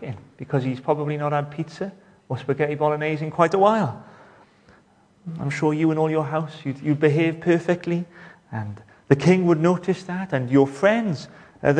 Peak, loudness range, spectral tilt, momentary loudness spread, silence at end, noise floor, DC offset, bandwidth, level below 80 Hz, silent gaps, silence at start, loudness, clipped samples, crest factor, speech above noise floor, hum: 0 dBFS; 4 LU; -7.5 dB/octave; 16 LU; 0 s; -57 dBFS; under 0.1%; 9.8 kHz; -62 dBFS; none; 0 s; -22 LUFS; under 0.1%; 22 dB; 35 dB; none